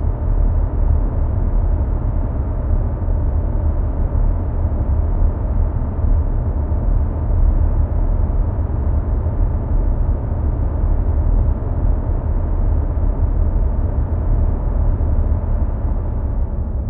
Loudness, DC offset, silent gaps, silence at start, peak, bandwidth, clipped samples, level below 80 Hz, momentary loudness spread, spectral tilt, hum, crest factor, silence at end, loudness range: -20 LUFS; under 0.1%; none; 0 s; -4 dBFS; 2.2 kHz; under 0.1%; -18 dBFS; 2 LU; -14 dB/octave; none; 12 dB; 0 s; 1 LU